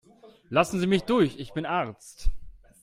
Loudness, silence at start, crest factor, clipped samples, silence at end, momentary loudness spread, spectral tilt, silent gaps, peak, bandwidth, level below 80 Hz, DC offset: -27 LUFS; 0.5 s; 20 dB; under 0.1%; 0.3 s; 13 LU; -6 dB/octave; none; -8 dBFS; 15.5 kHz; -36 dBFS; under 0.1%